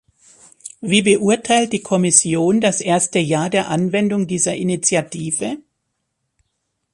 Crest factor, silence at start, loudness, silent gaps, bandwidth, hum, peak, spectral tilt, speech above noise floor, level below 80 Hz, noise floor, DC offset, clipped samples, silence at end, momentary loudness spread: 18 dB; 0.65 s; -17 LUFS; none; 11.5 kHz; none; 0 dBFS; -4 dB/octave; 56 dB; -58 dBFS; -73 dBFS; under 0.1%; under 0.1%; 1.35 s; 10 LU